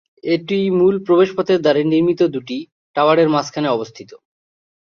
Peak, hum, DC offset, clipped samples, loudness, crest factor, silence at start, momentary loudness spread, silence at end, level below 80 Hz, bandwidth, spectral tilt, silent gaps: -2 dBFS; none; under 0.1%; under 0.1%; -17 LUFS; 16 dB; 0.25 s; 12 LU; 0.7 s; -60 dBFS; 7 kHz; -6.5 dB/octave; 2.72-2.94 s